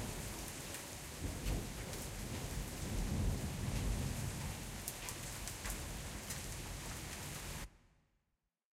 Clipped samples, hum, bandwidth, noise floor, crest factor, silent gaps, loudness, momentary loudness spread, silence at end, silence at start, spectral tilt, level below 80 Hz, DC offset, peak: under 0.1%; none; 16 kHz; -86 dBFS; 22 dB; none; -43 LUFS; 6 LU; 0.95 s; 0 s; -4 dB/octave; -48 dBFS; under 0.1%; -22 dBFS